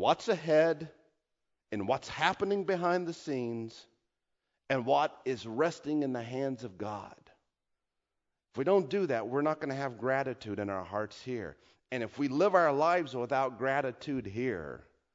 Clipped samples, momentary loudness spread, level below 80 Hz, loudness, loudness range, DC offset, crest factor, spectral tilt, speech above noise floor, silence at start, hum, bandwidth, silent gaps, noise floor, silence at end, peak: under 0.1%; 13 LU; -70 dBFS; -32 LUFS; 4 LU; under 0.1%; 22 dB; -6 dB/octave; 54 dB; 0 s; none; 7.8 kHz; none; -86 dBFS; 0.35 s; -10 dBFS